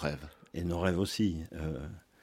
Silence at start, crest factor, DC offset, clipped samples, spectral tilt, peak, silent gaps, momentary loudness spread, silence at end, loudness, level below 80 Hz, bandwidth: 0 s; 20 dB; under 0.1%; under 0.1%; -6 dB/octave; -14 dBFS; none; 14 LU; 0.25 s; -34 LUFS; -52 dBFS; 16.5 kHz